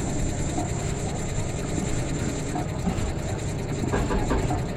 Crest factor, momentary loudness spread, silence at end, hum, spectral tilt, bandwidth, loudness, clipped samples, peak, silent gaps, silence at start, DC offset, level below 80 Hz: 14 dB; 4 LU; 0 s; none; -5.5 dB/octave; 14.5 kHz; -28 LUFS; under 0.1%; -12 dBFS; none; 0 s; under 0.1%; -32 dBFS